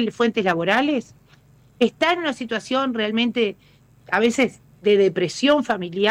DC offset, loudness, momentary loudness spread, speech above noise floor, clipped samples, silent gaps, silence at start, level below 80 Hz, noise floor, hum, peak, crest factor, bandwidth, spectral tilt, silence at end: under 0.1%; -21 LUFS; 7 LU; 33 dB; under 0.1%; none; 0 s; -60 dBFS; -53 dBFS; none; -8 dBFS; 14 dB; 12.5 kHz; -4.5 dB/octave; 0 s